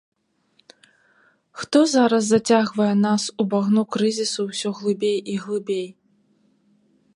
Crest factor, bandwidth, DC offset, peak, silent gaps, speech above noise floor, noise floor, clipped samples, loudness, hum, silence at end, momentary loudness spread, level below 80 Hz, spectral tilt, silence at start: 18 dB; 11 kHz; under 0.1%; -4 dBFS; none; 44 dB; -64 dBFS; under 0.1%; -21 LUFS; none; 1.25 s; 9 LU; -70 dBFS; -5 dB/octave; 1.55 s